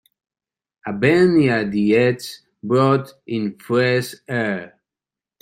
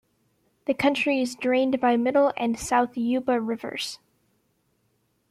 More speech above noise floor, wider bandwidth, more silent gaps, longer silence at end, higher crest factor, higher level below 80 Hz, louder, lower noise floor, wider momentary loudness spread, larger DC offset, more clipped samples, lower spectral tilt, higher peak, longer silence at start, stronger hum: first, 71 dB vs 47 dB; about the same, 16 kHz vs 15 kHz; neither; second, 0.75 s vs 1.35 s; about the same, 18 dB vs 18 dB; about the same, -58 dBFS vs -60 dBFS; first, -19 LUFS vs -24 LUFS; first, -89 dBFS vs -70 dBFS; first, 14 LU vs 10 LU; neither; neither; first, -6.5 dB/octave vs -4 dB/octave; first, -2 dBFS vs -8 dBFS; first, 0.85 s vs 0.7 s; neither